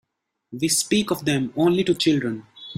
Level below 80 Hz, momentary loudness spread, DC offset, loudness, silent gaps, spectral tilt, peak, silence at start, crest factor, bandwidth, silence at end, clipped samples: -58 dBFS; 10 LU; under 0.1%; -21 LUFS; none; -4 dB/octave; -8 dBFS; 0.5 s; 16 dB; 16 kHz; 0.05 s; under 0.1%